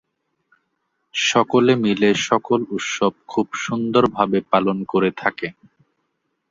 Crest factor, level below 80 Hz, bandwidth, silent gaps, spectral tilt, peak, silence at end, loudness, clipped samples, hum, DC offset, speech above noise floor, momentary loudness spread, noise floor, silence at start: 20 dB; -58 dBFS; 7.8 kHz; none; -4.5 dB/octave; 0 dBFS; 1 s; -19 LUFS; under 0.1%; none; under 0.1%; 54 dB; 8 LU; -73 dBFS; 1.15 s